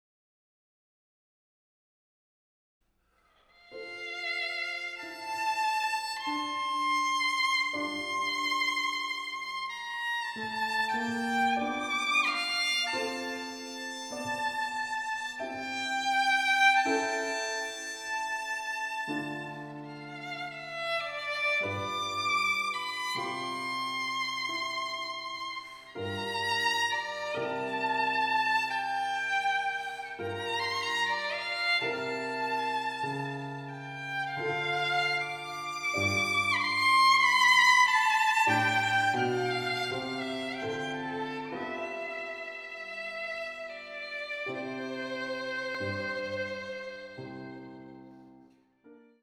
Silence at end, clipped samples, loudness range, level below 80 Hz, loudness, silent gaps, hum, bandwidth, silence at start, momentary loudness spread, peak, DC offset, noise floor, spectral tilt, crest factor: 0.25 s; under 0.1%; 12 LU; -74 dBFS; -29 LUFS; none; none; over 20 kHz; 3.7 s; 13 LU; -10 dBFS; under 0.1%; -70 dBFS; -2.5 dB/octave; 22 dB